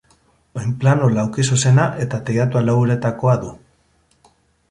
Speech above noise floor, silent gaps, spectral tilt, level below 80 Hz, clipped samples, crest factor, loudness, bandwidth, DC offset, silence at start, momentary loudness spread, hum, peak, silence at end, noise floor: 43 dB; none; -6 dB/octave; -50 dBFS; under 0.1%; 16 dB; -18 LUFS; 11.5 kHz; under 0.1%; 0.55 s; 10 LU; none; -2 dBFS; 1.15 s; -60 dBFS